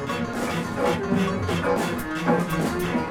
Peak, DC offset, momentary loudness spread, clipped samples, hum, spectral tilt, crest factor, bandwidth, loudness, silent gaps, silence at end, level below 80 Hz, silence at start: -8 dBFS; under 0.1%; 4 LU; under 0.1%; none; -6 dB/octave; 16 dB; 18.5 kHz; -25 LUFS; none; 0 s; -46 dBFS; 0 s